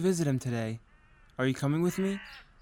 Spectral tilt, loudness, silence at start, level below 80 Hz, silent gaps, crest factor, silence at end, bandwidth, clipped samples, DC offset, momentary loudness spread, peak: -6.5 dB/octave; -31 LUFS; 0 s; -60 dBFS; none; 14 dB; 0.2 s; 17.5 kHz; under 0.1%; under 0.1%; 16 LU; -16 dBFS